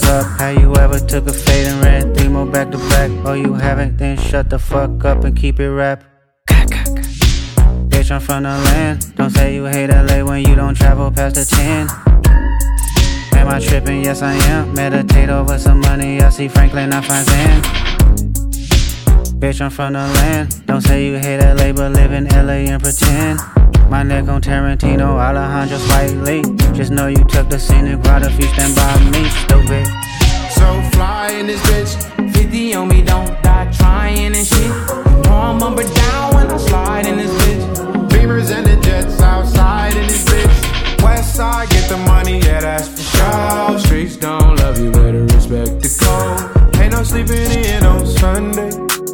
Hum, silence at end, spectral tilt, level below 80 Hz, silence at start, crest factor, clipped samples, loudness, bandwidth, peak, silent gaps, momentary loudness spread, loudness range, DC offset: none; 0 s; -5 dB/octave; -14 dBFS; 0 s; 10 dB; under 0.1%; -13 LUFS; 19 kHz; 0 dBFS; none; 5 LU; 2 LU; under 0.1%